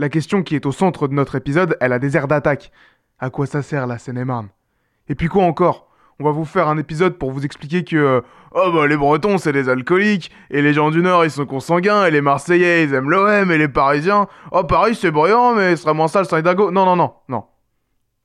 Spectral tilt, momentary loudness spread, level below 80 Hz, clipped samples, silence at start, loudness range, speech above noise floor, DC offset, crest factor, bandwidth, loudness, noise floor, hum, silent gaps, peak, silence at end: -7 dB/octave; 10 LU; -46 dBFS; under 0.1%; 0 s; 6 LU; 51 dB; under 0.1%; 14 dB; 12 kHz; -16 LUFS; -67 dBFS; none; none; -4 dBFS; 0.85 s